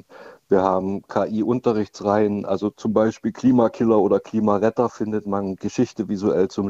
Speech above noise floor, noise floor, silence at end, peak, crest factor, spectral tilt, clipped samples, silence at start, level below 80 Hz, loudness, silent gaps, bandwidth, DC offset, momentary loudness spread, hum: 24 dB; -45 dBFS; 0 s; -4 dBFS; 16 dB; -7.5 dB/octave; under 0.1%; 0.15 s; -58 dBFS; -21 LUFS; none; 7.8 kHz; under 0.1%; 6 LU; none